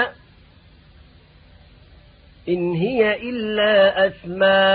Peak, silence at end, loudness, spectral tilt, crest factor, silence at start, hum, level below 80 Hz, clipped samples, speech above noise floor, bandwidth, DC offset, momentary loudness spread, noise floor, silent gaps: -4 dBFS; 0 s; -19 LUFS; -10 dB/octave; 16 dB; 0 s; none; -52 dBFS; under 0.1%; 32 dB; 4.9 kHz; under 0.1%; 10 LU; -50 dBFS; none